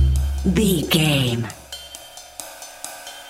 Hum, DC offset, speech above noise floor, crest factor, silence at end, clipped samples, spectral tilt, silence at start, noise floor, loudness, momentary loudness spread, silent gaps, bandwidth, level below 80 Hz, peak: none; under 0.1%; 21 dB; 18 dB; 0 s; under 0.1%; -5 dB/octave; 0 s; -40 dBFS; -19 LUFS; 18 LU; none; 17 kHz; -28 dBFS; -4 dBFS